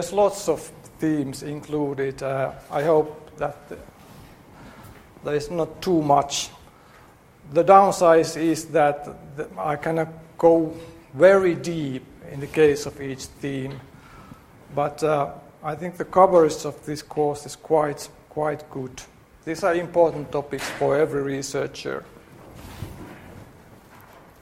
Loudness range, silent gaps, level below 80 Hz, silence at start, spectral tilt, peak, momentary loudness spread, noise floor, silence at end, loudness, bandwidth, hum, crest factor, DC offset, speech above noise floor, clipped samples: 8 LU; none; -54 dBFS; 0 s; -5.5 dB/octave; 0 dBFS; 20 LU; -51 dBFS; 0.95 s; -22 LUFS; 16 kHz; none; 22 dB; under 0.1%; 29 dB; under 0.1%